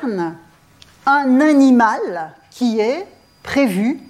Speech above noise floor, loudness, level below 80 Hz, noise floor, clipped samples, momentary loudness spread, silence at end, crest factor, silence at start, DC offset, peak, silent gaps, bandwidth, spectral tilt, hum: 33 dB; -16 LUFS; -56 dBFS; -48 dBFS; under 0.1%; 17 LU; 0.1 s; 14 dB; 0 s; under 0.1%; -4 dBFS; none; 13.5 kHz; -5.5 dB/octave; none